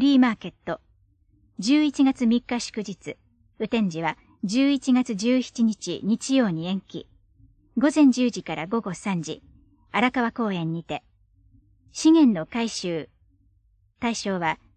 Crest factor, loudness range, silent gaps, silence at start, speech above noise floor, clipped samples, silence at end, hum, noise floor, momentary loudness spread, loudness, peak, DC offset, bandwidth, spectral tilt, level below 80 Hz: 18 dB; 2 LU; none; 0 s; 40 dB; under 0.1%; 0.2 s; none; -63 dBFS; 16 LU; -24 LUFS; -6 dBFS; under 0.1%; 9.6 kHz; -5 dB/octave; -60 dBFS